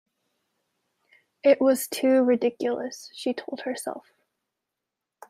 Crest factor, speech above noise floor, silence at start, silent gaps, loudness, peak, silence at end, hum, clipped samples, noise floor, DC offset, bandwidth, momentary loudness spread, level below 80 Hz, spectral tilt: 20 dB; 62 dB; 1.45 s; none; -24 LUFS; -6 dBFS; 1.3 s; none; under 0.1%; -86 dBFS; under 0.1%; 15.5 kHz; 14 LU; -80 dBFS; -3.5 dB/octave